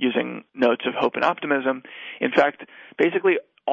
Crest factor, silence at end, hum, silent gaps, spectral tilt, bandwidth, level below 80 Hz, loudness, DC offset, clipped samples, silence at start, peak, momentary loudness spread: 18 dB; 0 s; none; none; -6 dB/octave; 7.4 kHz; -70 dBFS; -23 LUFS; under 0.1%; under 0.1%; 0 s; -6 dBFS; 11 LU